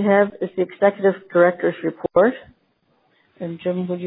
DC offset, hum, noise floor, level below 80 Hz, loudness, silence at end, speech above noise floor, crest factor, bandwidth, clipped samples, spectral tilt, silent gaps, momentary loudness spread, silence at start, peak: under 0.1%; none; -64 dBFS; -62 dBFS; -20 LUFS; 0 s; 45 dB; 18 dB; 4 kHz; under 0.1%; -11 dB/octave; none; 11 LU; 0 s; -2 dBFS